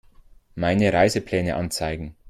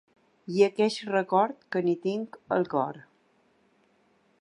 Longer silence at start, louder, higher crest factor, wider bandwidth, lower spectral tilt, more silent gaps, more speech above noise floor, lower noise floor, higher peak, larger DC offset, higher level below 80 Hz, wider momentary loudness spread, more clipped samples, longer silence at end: about the same, 0.55 s vs 0.5 s; first, -22 LUFS vs -27 LUFS; about the same, 18 dB vs 20 dB; first, 14.5 kHz vs 11 kHz; about the same, -5.5 dB/octave vs -6 dB/octave; neither; second, 29 dB vs 40 dB; second, -51 dBFS vs -66 dBFS; about the same, -6 dBFS vs -8 dBFS; neither; first, -46 dBFS vs -78 dBFS; about the same, 10 LU vs 11 LU; neither; second, 0 s vs 1.4 s